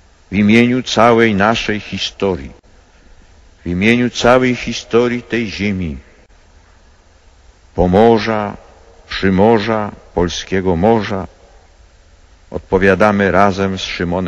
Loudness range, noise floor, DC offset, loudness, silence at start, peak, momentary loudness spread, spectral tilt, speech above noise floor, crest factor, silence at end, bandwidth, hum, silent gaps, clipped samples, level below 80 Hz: 3 LU; -47 dBFS; under 0.1%; -14 LUFS; 0.3 s; 0 dBFS; 14 LU; -6 dB/octave; 33 dB; 16 dB; 0 s; 8.8 kHz; none; none; under 0.1%; -36 dBFS